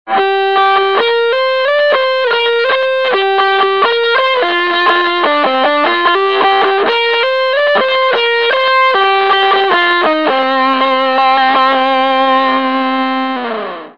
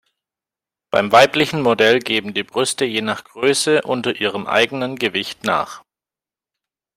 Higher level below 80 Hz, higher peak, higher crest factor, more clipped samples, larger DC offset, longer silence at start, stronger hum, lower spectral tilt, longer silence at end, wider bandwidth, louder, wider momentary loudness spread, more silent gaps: about the same, -66 dBFS vs -62 dBFS; about the same, 0 dBFS vs 0 dBFS; second, 12 dB vs 20 dB; neither; first, 0.7% vs under 0.1%; second, 0.05 s vs 0.95 s; neither; about the same, -4 dB/octave vs -3.5 dB/octave; second, 0.05 s vs 1.15 s; second, 6.8 kHz vs 16 kHz; first, -11 LUFS vs -17 LUFS; second, 3 LU vs 9 LU; neither